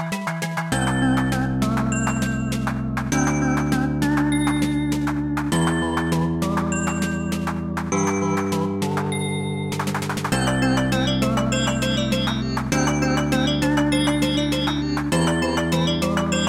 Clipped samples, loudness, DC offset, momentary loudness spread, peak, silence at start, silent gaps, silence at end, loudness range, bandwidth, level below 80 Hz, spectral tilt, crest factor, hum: under 0.1%; -22 LUFS; under 0.1%; 5 LU; -8 dBFS; 0 s; none; 0 s; 2 LU; 16.5 kHz; -38 dBFS; -5 dB/octave; 14 dB; none